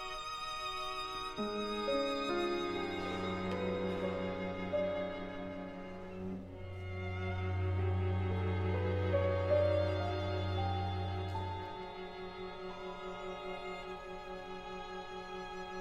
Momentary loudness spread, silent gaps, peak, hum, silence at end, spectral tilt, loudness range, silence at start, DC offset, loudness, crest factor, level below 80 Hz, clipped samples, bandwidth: 11 LU; none; -20 dBFS; none; 0 s; -6.5 dB/octave; 10 LU; 0 s; under 0.1%; -38 LUFS; 16 dB; -56 dBFS; under 0.1%; 10.5 kHz